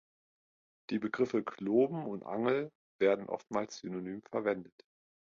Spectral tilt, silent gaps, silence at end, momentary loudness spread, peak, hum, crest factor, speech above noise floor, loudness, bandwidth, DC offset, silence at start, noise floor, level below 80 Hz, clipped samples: -6.5 dB/octave; 2.75-2.99 s; 0.75 s; 10 LU; -16 dBFS; none; 18 dB; over 56 dB; -34 LUFS; 7.4 kHz; under 0.1%; 0.9 s; under -90 dBFS; -76 dBFS; under 0.1%